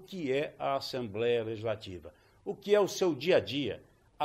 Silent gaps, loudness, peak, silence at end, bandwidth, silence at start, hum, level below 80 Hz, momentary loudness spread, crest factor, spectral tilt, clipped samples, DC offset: none; -31 LUFS; -14 dBFS; 0 s; 15.5 kHz; 0 s; none; -68 dBFS; 16 LU; 18 dB; -5 dB/octave; under 0.1%; under 0.1%